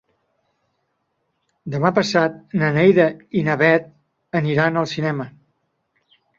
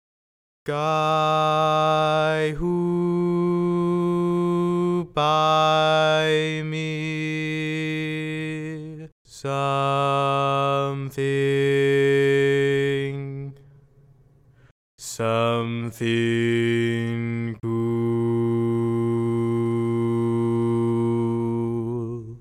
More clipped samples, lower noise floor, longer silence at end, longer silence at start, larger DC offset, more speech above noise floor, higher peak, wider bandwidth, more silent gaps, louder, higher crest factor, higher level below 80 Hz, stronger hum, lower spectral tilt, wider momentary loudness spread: neither; first, -72 dBFS vs -55 dBFS; first, 1.1 s vs 0 s; first, 1.65 s vs 0.65 s; neither; first, 54 dB vs 34 dB; first, -2 dBFS vs -8 dBFS; second, 7.6 kHz vs 14 kHz; second, none vs 9.12-9.25 s, 14.71-14.98 s; first, -19 LUFS vs -22 LUFS; about the same, 18 dB vs 14 dB; second, -60 dBFS vs -52 dBFS; neither; about the same, -6.5 dB/octave vs -6.5 dB/octave; about the same, 12 LU vs 10 LU